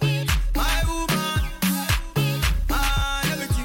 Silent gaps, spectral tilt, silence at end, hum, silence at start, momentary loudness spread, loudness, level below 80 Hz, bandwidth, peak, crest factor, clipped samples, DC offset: none; -4 dB/octave; 0 s; none; 0 s; 2 LU; -23 LUFS; -26 dBFS; 17 kHz; -8 dBFS; 14 dB; under 0.1%; under 0.1%